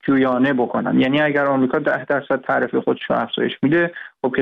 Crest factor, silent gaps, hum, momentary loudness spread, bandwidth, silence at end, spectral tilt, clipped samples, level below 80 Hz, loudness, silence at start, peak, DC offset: 10 dB; none; none; 5 LU; 4.4 kHz; 0 s; -8.5 dB/octave; under 0.1%; -60 dBFS; -19 LUFS; 0.05 s; -8 dBFS; under 0.1%